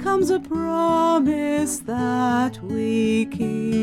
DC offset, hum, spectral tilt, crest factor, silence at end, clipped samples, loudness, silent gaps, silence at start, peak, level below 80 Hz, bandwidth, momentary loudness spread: under 0.1%; none; -5.5 dB/octave; 12 dB; 0 s; under 0.1%; -21 LUFS; none; 0 s; -10 dBFS; -52 dBFS; 15.5 kHz; 6 LU